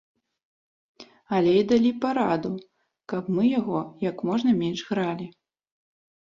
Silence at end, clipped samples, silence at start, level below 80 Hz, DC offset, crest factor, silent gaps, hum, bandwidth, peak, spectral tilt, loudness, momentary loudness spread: 1 s; under 0.1%; 1 s; -64 dBFS; under 0.1%; 16 dB; none; none; 7.4 kHz; -10 dBFS; -7 dB/octave; -25 LUFS; 12 LU